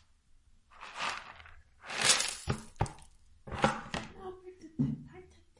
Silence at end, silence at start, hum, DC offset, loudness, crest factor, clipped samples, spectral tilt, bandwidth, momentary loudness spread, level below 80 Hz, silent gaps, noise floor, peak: 0.35 s; 0.7 s; none; under 0.1%; -33 LUFS; 28 dB; under 0.1%; -2.5 dB/octave; 11.5 kHz; 24 LU; -54 dBFS; none; -63 dBFS; -10 dBFS